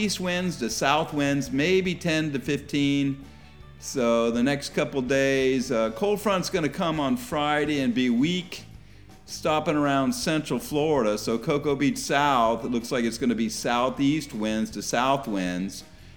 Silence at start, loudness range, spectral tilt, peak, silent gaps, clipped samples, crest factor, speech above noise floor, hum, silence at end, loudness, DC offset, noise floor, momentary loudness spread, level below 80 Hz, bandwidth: 0 s; 2 LU; -4.5 dB/octave; -6 dBFS; none; under 0.1%; 18 dB; 24 dB; none; 0.05 s; -25 LUFS; 0.2%; -49 dBFS; 6 LU; -52 dBFS; over 20 kHz